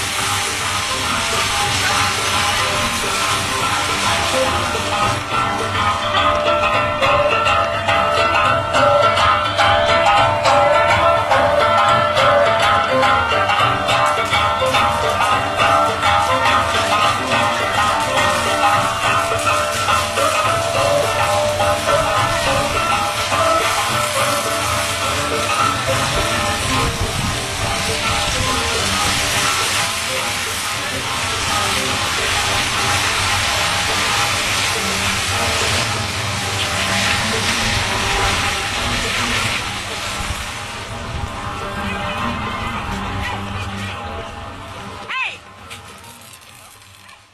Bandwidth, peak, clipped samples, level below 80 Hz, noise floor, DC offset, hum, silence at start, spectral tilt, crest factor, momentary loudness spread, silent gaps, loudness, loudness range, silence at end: 14 kHz; -2 dBFS; under 0.1%; -36 dBFS; -43 dBFS; under 0.1%; none; 0 s; -2.5 dB/octave; 16 dB; 9 LU; none; -16 LUFS; 10 LU; 0.2 s